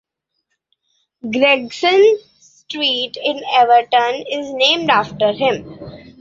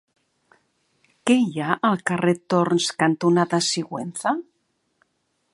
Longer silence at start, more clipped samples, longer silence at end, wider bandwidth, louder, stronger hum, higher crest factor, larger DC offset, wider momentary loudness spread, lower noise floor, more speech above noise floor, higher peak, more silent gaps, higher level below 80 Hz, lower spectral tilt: about the same, 1.25 s vs 1.25 s; neither; second, 0.2 s vs 1.1 s; second, 7.6 kHz vs 11.5 kHz; first, -15 LUFS vs -22 LUFS; neither; about the same, 16 dB vs 20 dB; neither; first, 15 LU vs 7 LU; about the same, -73 dBFS vs -72 dBFS; first, 58 dB vs 51 dB; about the same, 0 dBFS vs -2 dBFS; neither; first, -58 dBFS vs -70 dBFS; about the same, -3.5 dB/octave vs -4.5 dB/octave